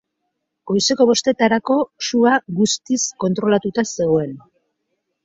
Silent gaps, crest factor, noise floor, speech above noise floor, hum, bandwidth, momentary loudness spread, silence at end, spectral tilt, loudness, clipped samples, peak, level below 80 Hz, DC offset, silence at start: none; 16 dB; -75 dBFS; 58 dB; none; 8 kHz; 6 LU; 0.85 s; -4 dB/octave; -18 LUFS; under 0.1%; -2 dBFS; -60 dBFS; under 0.1%; 0.65 s